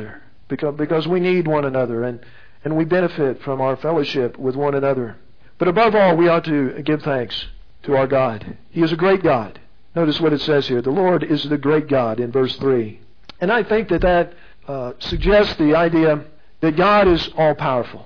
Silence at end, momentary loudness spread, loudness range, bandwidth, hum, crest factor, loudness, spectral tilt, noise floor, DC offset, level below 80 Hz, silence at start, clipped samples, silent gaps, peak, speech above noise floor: 0 s; 12 LU; 3 LU; 5.4 kHz; none; 14 dB; -18 LUFS; -8 dB/octave; -38 dBFS; 1%; -38 dBFS; 0 s; under 0.1%; none; -4 dBFS; 20 dB